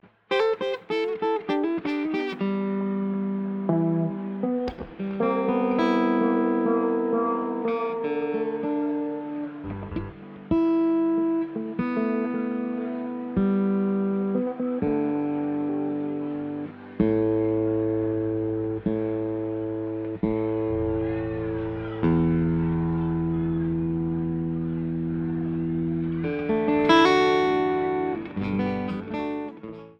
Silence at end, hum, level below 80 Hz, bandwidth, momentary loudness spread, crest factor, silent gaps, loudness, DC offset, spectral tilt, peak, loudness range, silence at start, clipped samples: 0.05 s; none; -48 dBFS; 7 kHz; 8 LU; 20 dB; none; -26 LUFS; under 0.1%; -8.5 dB/octave; -4 dBFS; 5 LU; 0.3 s; under 0.1%